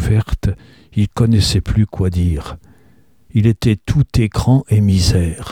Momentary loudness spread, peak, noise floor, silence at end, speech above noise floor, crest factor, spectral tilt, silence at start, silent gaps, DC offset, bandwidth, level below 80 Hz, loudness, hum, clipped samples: 9 LU; -2 dBFS; -52 dBFS; 0 s; 38 dB; 14 dB; -6.5 dB/octave; 0 s; none; 0.2%; 14.5 kHz; -28 dBFS; -16 LUFS; none; under 0.1%